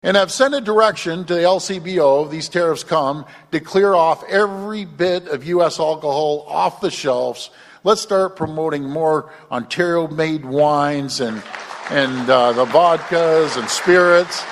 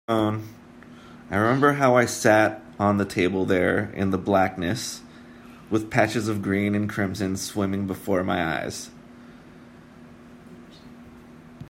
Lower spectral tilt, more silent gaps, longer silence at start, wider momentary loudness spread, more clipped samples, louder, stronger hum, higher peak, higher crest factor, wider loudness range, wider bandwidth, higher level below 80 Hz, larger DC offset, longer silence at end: about the same, -4.5 dB/octave vs -5.5 dB/octave; neither; about the same, 0.05 s vs 0.1 s; about the same, 10 LU vs 10 LU; neither; first, -17 LUFS vs -23 LUFS; neither; first, 0 dBFS vs -4 dBFS; about the same, 18 dB vs 22 dB; second, 4 LU vs 9 LU; second, 13 kHz vs 16 kHz; about the same, -60 dBFS vs -58 dBFS; neither; about the same, 0 s vs 0 s